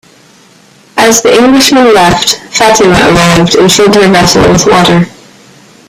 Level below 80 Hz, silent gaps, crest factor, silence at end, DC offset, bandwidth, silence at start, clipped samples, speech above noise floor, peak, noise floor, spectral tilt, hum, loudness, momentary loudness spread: -30 dBFS; none; 6 dB; 0.8 s; under 0.1%; over 20 kHz; 0.95 s; 0.9%; 35 dB; 0 dBFS; -39 dBFS; -4 dB/octave; none; -4 LUFS; 5 LU